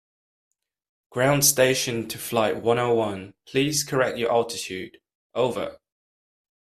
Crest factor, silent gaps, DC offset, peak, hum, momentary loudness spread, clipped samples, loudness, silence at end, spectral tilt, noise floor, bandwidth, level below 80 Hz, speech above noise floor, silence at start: 20 dB; 5.15-5.30 s; under 0.1%; -6 dBFS; none; 17 LU; under 0.1%; -23 LUFS; 0.9 s; -3.5 dB/octave; under -90 dBFS; 15.5 kHz; -60 dBFS; over 67 dB; 1.1 s